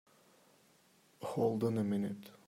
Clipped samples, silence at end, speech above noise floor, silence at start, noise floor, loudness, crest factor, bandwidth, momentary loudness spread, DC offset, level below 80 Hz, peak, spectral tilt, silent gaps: under 0.1%; 0.15 s; 33 dB; 1.2 s; -68 dBFS; -36 LUFS; 18 dB; 16 kHz; 9 LU; under 0.1%; -80 dBFS; -20 dBFS; -8 dB/octave; none